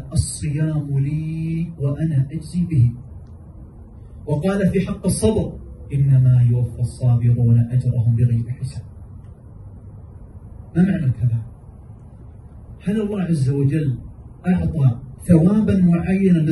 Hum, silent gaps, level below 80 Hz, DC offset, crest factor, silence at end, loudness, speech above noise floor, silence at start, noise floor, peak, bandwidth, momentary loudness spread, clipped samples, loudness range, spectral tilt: none; none; -38 dBFS; under 0.1%; 18 dB; 0 s; -19 LUFS; 22 dB; 0 s; -40 dBFS; -2 dBFS; 12 kHz; 24 LU; under 0.1%; 7 LU; -8 dB/octave